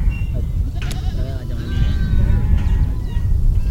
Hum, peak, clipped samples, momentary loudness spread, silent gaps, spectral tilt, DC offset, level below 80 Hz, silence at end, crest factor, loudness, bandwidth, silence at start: none; -4 dBFS; under 0.1%; 6 LU; none; -7.5 dB/octave; under 0.1%; -18 dBFS; 0 s; 14 dB; -21 LUFS; 11.5 kHz; 0 s